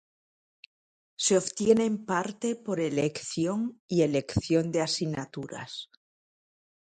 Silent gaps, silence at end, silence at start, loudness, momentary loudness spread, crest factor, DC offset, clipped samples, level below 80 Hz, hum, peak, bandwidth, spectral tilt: 3.80-3.88 s; 1 s; 1.2 s; -28 LUFS; 14 LU; 20 dB; under 0.1%; under 0.1%; -56 dBFS; none; -8 dBFS; 9.6 kHz; -4.5 dB/octave